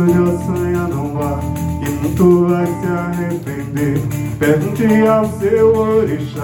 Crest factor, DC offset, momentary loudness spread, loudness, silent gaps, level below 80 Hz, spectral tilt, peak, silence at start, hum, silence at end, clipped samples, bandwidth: 14 dB; under 0.1%; 8 LU; -16 LUFS; none; -36 dBFS; -8 dB/octave; 0 dBFS; 0 s; none; 0 s; under 0.1%; 17 kHz